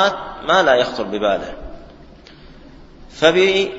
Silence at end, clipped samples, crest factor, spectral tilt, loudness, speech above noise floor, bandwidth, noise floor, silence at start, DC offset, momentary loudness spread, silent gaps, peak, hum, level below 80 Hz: 0 s; under 0.1%; 18 dB; -4 dB/octave; -16 LUFS; 25 dB; 7.8 kHz; -42 dBFS; 0 s; under 0.1%; 18 LU; none; 0 dBFS; none; -44 dBFS